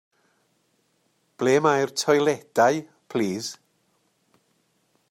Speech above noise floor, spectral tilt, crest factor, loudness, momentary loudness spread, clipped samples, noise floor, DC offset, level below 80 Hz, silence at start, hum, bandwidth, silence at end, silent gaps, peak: 47 dB; -4.5 dB/octave; 20 dB; -23 LUFS; 12 LU; under 0.1%; -69 dBFS; under 0.1%; -72 dBFS; 1.4 s; none; 16 kHz; 1.55 s; none; -6 dBFS